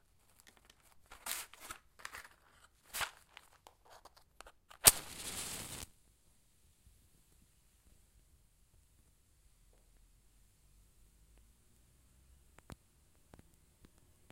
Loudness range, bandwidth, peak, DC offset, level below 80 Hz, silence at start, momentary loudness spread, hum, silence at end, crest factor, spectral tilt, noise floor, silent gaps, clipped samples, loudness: 14 LU; 16 kHz; -2 dBFS; under 0.1%; -64 dBFS; 1.1 s; 33 LU; none; 1.6 s; 42 dB; 0 dB/octave; -71 dBFS; none; under 0.1%; -34 LUFS